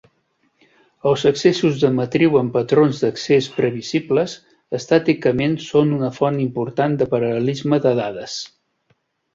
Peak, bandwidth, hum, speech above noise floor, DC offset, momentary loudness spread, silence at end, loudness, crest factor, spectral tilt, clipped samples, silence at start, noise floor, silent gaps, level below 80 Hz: -2 dBFS; 7.8 kHz; none; 47 dB; under 0.1%; 10 LU; 0.85 s; -19 LUFS; 18 dB; -6.5 dB/octave; under 0.1%; 1.05 s; -65 dBFS; none; -56 dBFS